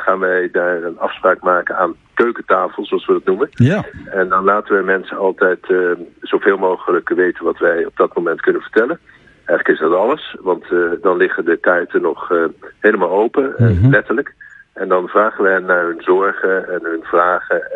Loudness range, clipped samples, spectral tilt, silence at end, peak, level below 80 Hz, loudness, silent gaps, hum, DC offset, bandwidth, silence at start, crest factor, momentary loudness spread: 2 LU; under 0.1%; -9 dB/octave; 0 s; 0 dBFS; -50 dBFS; -16 LUFS; none; none; under 0.1%; 6.8 kHz; 0 s; 16 dB; 7 LU